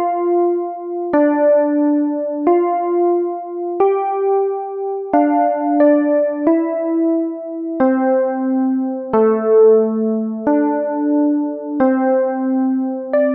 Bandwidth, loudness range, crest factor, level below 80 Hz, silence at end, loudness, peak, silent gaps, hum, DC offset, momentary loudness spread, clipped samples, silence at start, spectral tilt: 3.2 kHz; 2 LU; 14 dB; -62 dBFS; 0 s; -16 LUFS; -2 dBFS; none; none; under 0.1%; 8 LU; under 0.1%; 0 s; -7.5 dB/octave